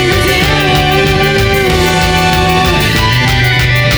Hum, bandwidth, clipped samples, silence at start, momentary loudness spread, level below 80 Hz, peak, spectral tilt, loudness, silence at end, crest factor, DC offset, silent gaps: none; over 20 kHz; under 0.1%; 0 s; 1 LU; -20 dBFS; 0 dBFS; -4.5 dB/octave; -9 LUFS; 0 s; 10 dB; under 0.1%; none